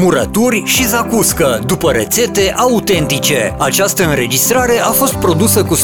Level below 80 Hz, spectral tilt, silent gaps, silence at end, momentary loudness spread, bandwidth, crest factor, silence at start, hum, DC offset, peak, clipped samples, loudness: -34 dBFS; -3.5 dB/octave; none; 0 s; 3 LU; 19.5 kHz; 12 dB; 0 s; none; 0.2%; 0 dBFS; under 0.1%; -12 LUFS